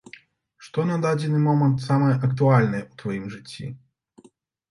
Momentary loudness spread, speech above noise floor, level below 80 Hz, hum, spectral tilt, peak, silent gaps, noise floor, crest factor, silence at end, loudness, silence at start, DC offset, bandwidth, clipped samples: 17 LU; 36 dB; -60 dBFS; none; -8 dB/octave; -4 dBFS; none; -57 dBFS; 20 dB; 0.95 s; -22 LUFS; 0.6 s; under 0.1%; 11 kHz; under 0.1%